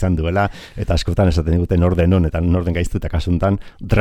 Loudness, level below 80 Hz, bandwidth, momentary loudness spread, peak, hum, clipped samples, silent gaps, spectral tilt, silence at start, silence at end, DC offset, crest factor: -18 LUFS; -26 dBFS; 9.4 kHz; 7 LU; -2 dBFS; none; under 0.1%; none; -7.5 dB/octave; 0 s; 0 s; under 0.1%; 14 dB